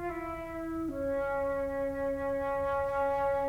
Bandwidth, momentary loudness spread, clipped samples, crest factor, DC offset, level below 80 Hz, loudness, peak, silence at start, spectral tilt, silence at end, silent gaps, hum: 16 kHz; 7 LU; under 0.1%; 12 dB; under 0.1%; -50 dBFS; -33 LUFS; -20 dBFS; 0 s; -7 dB/octave; 0 s; none; none